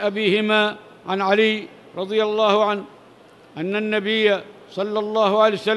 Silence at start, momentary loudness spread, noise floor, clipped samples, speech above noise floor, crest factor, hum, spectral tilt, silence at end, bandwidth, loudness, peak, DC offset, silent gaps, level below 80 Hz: 0 s; 13 LU; -48 dBFS; under 0.1%; 28 dB; 18 dB; none; -5.5 dB/octave; 0 s; 11.5 kHz; -20 LUFS; -2 dBFS; under 0.1%; none; -74 dBFS